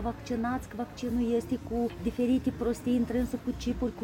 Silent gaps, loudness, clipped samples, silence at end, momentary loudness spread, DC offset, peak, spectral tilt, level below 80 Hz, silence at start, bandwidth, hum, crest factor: none; -31 LUFS; under 0.1%; 0 s; 5 LU; under 0.1%; -18 dBFS; -6.5 dB/octave; -44 dBFS; 0 s; 17 kHz; none; 12 dB